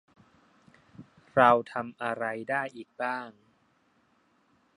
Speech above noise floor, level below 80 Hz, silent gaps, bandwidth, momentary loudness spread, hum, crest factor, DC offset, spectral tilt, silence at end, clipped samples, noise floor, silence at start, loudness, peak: 41 dB; -72 dBFS; none; 11.5 kHz; 16 LU; none; 26 dB; under 0.1%; -6 dB/octave; 1.45 s; under 0.1%; -68 dBFS; 1 s; -28 LUFS; -6 dBFS